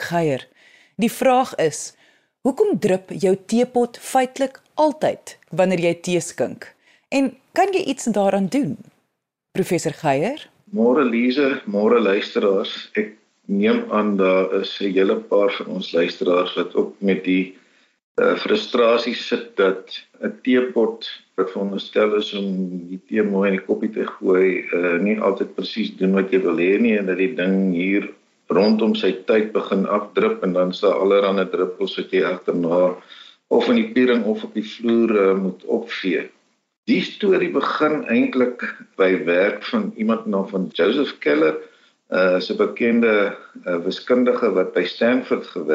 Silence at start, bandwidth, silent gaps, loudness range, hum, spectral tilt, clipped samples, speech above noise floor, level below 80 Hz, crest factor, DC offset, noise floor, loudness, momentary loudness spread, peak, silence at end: 0 s; 15.5 kHz; 18.04-18.15 s, 36.77-36.83 s; 3 LU; none; -5.5 dB/octave; under 0.1%; 56 dB; -70 dBFS; 16 dB; under 0.1%; -76 dBFS; -20 LUFS; 9 LU; -4 dBFS; 0 s